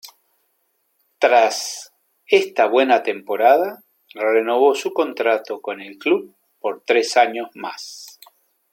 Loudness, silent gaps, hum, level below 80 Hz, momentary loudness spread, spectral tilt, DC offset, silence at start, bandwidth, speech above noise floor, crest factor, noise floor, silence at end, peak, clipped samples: -18 LUFS; none; none; -76 dBFS; 15 LU; -2 dB/octave; under 0.1%; 0.05 s; 17 kHz; 50 dB; 20 dB; -68 dBFS; 0.65 s; 0 dBFS; under 0.1%